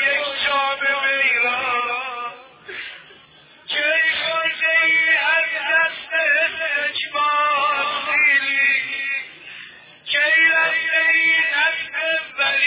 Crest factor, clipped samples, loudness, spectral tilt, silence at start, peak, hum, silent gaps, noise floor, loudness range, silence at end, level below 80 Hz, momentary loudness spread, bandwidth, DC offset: 14 dB; under 0.1%; -17 LUFS; -3.5 dB/octave; 0 s; -6 dBFS; none; none; -48 dBFS; 4 LU; 0 s; -66 dBFS; 15 LU; 4 kHz; under 0.1%